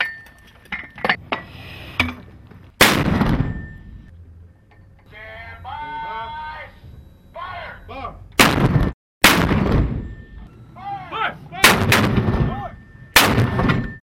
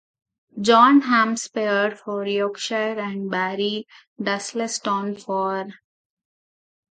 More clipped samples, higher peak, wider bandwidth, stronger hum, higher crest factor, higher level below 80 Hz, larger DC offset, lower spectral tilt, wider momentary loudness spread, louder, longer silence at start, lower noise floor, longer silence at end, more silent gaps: neither; about the same, 0 dBFS vs -2 dBFS; first, 16.5 kHz vs 9.4 kHz; neither; about the same, 22 dB vs 20 dB; first, -32 dBFS vs -76 dBFS; neither; about the same, -4 dB/octave vs -4 dB/octave; first, 22 LU vs 13 LU; first, -18 LUFS vs -21 LUFS; second, 0 s vs 0.55 s; second, -48 dBFS vs under -90 dBFS; second, 0.15 s vs 1.2 s; first, 8.94-9.21 s vs 4.07-4.16 s